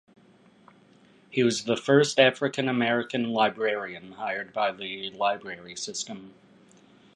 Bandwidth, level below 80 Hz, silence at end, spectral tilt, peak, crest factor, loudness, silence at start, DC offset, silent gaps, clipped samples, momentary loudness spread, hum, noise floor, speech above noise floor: 11.5 kHz; -72 dBFS; 0.85 s; -4 dB/octave; -4 dBFS; 22 dB; -26 LUFS; 1.3 s; under 0.1%; none; under 0.1%; 14 LU; none; -58 dBFS; 31 dB